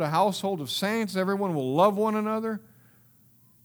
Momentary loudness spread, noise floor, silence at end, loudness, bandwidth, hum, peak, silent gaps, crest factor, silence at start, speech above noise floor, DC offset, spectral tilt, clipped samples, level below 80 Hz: 8 LU; -59 dBFS; 1.05 s; -26 LUFS; over 20 kHz; none; -8 dBFS; none; 20 dB; 0 s; 33 dB; under 0.1%; -5.5 dB/octave; under 0.1%; -74 dBFS